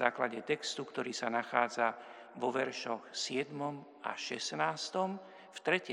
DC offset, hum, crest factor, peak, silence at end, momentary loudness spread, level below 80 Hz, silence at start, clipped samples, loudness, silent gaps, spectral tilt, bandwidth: under 0.1%; none; 24 dB; -12 dBFS; 0 s; 9 LU; under -90 dBFS; 0 s; under 0.1%; -36 LUFS; none; -3 dB/octave; 11.5 kHz